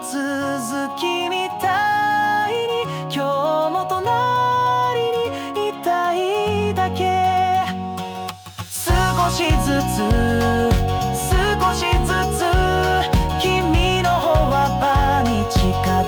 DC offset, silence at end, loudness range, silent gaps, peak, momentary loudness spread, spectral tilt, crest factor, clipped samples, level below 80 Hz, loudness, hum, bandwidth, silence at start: under 0.1%; 0 s; 3 LU; none; -8 dBFS; 6 LU; -5 dB/octave; 12 dB; under 0.1%; -28 dBFS; -19 LUFS; none; over 20 kHz; 0 s